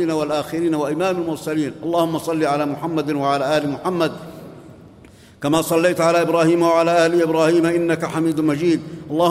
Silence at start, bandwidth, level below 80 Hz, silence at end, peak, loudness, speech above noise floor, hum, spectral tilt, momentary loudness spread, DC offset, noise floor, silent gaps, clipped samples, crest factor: 0 s; 15.5 kHz; -56 dBFS; 0 s; -4 dBFS; -19 LUFS; 27 dB; none; -5.5 dB/octave; 8 LU; under 0.1%; -45 dBFS; none; under 0.1%; 16 dB